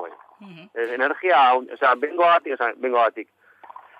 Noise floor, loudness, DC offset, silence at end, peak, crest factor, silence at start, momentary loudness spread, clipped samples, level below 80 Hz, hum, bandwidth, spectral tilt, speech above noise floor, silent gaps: -45 dBFS; -20 LUFS; under 0.1%; 0.75 s; -8 dBFS; 14 dB; 0 s; 14 LU; under 0.1%; -84 dBFS; none; 5.2 kHz; -5 dB/octave; 25 dB; none